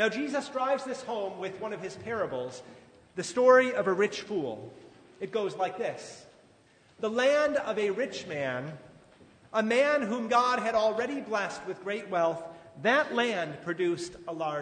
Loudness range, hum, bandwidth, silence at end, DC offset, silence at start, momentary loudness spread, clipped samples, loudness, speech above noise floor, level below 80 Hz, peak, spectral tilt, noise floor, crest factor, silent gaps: 5 LU; none; 9.6 kHz; 0 s; under 0.1%; 0 s; 13 LU; under 0.1%; -29 LUFS; 32 dB; -72 dBFS; -8 dBFS; -4.5 dB/octave; -61 dBFS; 20 dB; none